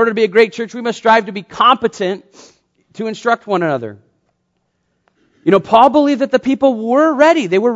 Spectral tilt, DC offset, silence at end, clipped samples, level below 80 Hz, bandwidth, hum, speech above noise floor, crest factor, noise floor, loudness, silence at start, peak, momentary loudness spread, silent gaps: -5.5 dB/octave; under 0.1%; 0 s; 0.1%; -58 dBFS; 8 kHz; none; 53 dB; 14 dB; -67 dBFS; -14 LUFS; 0 s; 0 dBFS; 12 LU; none